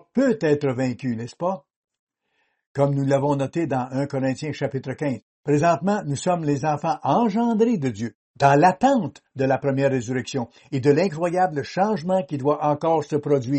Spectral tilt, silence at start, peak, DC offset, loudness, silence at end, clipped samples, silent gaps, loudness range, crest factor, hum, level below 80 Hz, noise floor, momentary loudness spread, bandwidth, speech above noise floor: -7 dB/octave; 0.15 s; -2 dBFS; under 0.1%; -22 LUFS; 0 s; under 0.1%; 1.76-1.88 s, 1.99-2.07 s, 2.67-2.75 s, 5.22-5.43 s, 8.15-8.34 s; 4 LU; 20 dB; none; -62 dBFS; -71 dBFS; 8 LU; 8.6 kHz; 50 dB